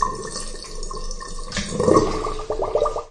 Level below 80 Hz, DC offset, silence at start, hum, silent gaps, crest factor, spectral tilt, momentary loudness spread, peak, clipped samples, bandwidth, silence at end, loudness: -32 dBFS; under 0.1%; 0 s; none; none; 22 dB; -4.5 dB/octave; 16 LU; -2 dBFS; under 0.1%; 11.5 kHz; 0 s; -24 LUFS